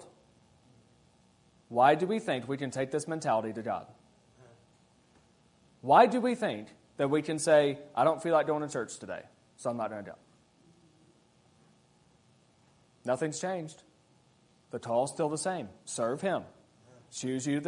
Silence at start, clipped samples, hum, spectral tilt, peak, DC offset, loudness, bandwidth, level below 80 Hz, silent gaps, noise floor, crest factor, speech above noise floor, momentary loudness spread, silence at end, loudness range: 0 s; under 0.1%; none; -5 dB/octave; -8 dBFS; under 0.1%; -30 LUFS; 11 kHz; -76 dBFS; none; -65 dBFS; 24 dB; 36 dB; 17 LU; 0 s; 13 LU